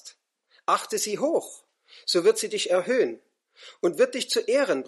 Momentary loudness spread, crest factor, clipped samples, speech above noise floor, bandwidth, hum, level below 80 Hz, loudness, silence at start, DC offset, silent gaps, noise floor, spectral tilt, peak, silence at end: 9 LU; 18 dB; under 0.1%; 40 dB; 13 kHz; none; -84 dBFS; -25 LUFS; 0.05 s; under 0.1%; none; -65 dBFS; -2.5 dB/octave; -8 dBFS; 0 s